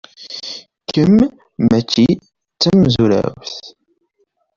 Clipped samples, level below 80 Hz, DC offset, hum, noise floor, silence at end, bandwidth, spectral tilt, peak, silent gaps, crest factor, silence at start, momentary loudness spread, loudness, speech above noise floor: under 0.1%; -44 dBFS; under 0.1%; none; -65 dBFS; 0.9 s; 7.4 kHz; -6.5 dB/octave; -2 dBFS; none; 14 dB; 0.2 s; 17 LU; -15 LUFS; 51 dB